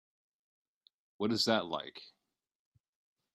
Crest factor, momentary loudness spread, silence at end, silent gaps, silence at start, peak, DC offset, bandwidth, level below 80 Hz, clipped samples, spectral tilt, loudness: 26 dB; 17 LU; 1.25 s; none; 1.2 s; -14 dBFS; under 0.1%; 13 kHz; -78 dBFS; under 0.1%; -4 dB/octave; -33 LUFS